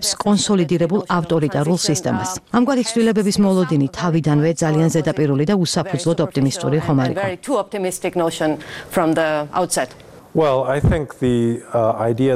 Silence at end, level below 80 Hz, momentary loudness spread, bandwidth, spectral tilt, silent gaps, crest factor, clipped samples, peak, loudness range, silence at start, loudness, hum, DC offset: 0 s; -42 dBFS; 5 LU; 15.5 kHz; -5.5 dB/octave; none; 16 dB; under 0.1%; -2 dBFS; 3 LU; 0 s; -18 LUFS; none; under 0.1%